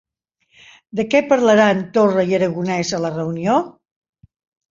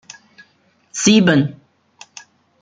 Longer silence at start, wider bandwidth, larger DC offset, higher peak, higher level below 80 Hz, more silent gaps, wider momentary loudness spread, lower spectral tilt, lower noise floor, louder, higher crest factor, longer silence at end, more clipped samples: about the same, 0.95 s vs 0.95 s; second, 7.6 kHz vs 9.4 kHz; neither; about the same, 0 dBFS vs -2 dBFS; about the same, -58 dBFS vs -58 dBFS; neither; second, 9 LU vs 26 LU; about the same, -5.5 dB/octave vs -4.5 dB/octave; first, -65 dBFS vs -58 dBFS; second, -17 LUFS vs -14 LUFS; about the same, 18 dB vs 18 dB; about the same, 1 s vs 1.1 s; neither